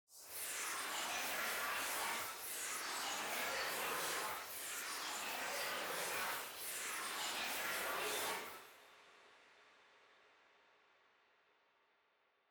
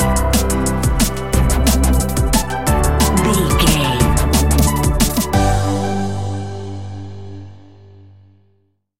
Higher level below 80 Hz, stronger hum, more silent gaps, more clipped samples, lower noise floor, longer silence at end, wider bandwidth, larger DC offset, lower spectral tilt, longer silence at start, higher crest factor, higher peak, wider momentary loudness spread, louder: second, -80 dBFS vs -20 dBFS; second, none vs 50 Hz at -40 dBFS; neither; neither; first, -78 dBFS vs -61 dBFS; first, 2.35 s vs 0 s; first, over 20 kHz vs 17 kHz; second, under 0.1% vs 3%; second, 0.5 dB/octave vs -4.5 dB/octave; about the same, 0.1 s vs 0 s; about the same, 14 dB vs 16 dB; second, -30 dBFS vs 0 dBFS; second, 5 LU vs 14 LU; second, -41 LUFS vs -16 LUFS